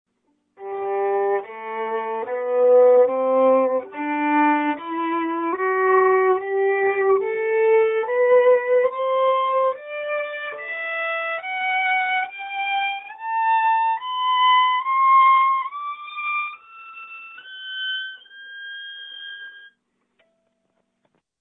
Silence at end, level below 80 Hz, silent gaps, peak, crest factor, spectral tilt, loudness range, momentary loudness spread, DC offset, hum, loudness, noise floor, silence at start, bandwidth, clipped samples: 1.75 s; -74 dBFS; none; -6 dBFS; 14 dB; -6.5 dB/octave; 14 LU; 18 LU; under 0.1%; none; -20 LUFS; -71 dBFS; 0.6 s; 4 kHz; under 0.1%